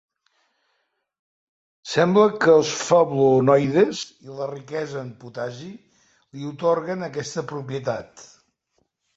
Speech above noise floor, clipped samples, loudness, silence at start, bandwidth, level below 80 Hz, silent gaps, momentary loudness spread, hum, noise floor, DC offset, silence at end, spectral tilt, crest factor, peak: 52 dB; under 0.1%; -21 LUFS; 1.85 s; 8 kHz; -64 dBFS; none; 18 LU; none; -73 dBFS; under 0.1%; 0.95 s; -5.5 dB/octave; 18 dB; -4 dBFS